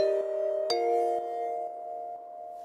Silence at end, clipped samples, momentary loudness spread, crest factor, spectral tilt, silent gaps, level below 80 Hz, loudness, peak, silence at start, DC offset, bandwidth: 0 s; under 0.1%; 13 LU; 16 dB; -2.5 dB/octave; none; -80 dBFS; -31 LUFS; -16 dBFS; 0 s; under 0.1%; 13.5 kHz